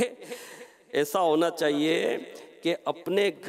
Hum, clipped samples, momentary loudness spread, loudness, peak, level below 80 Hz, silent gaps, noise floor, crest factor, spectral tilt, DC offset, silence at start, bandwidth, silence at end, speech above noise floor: none; under 0.1%; 17 LU; -27 LUFS; -12 dBFS; -82 dBFS; none; -48 dBFS; 16 dB; -4 dB/octave; under 0.1%; 0 s; 16 kHz; 0 s; 22 dB